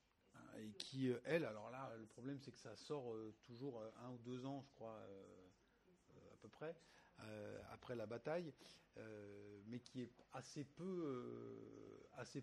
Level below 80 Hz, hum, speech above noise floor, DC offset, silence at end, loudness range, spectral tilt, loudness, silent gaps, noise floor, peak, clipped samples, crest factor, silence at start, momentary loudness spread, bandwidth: -84 dBFS; none; 25 dB; under 0.1%; 0 s; 8 LU; -6 dB/octave; -52 LUFS; none; -76 dBFS; -28 dBFS; under 0.1%; 24 dB; 0.25 s; 16 LU; 13 kHz